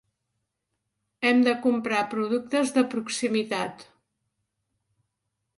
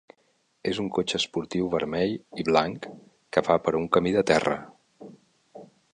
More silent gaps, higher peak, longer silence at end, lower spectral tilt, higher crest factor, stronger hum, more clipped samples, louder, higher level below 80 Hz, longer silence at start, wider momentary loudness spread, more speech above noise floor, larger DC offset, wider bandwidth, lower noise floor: neither; second, -8 dBFS vs -4 dBFS; first, 1.75 s vs 0.3 s; about the same, -4 dB/octave vs -5 dB/octave; about the same, 20 dB vs 22 dB; neither; neither; about the same, -25 LUFS vs -26 LUFS; second, -74 dBFS vs -58 dBFS; first, 1.2 s vs 0.65 s; about the same, 7 LU vs 9 LU; first, 56 dB vs 43 dB; neither; about the same, 11.5 kHz vs 10.5 kHz; first, -81 dBFS vs -69 dBFS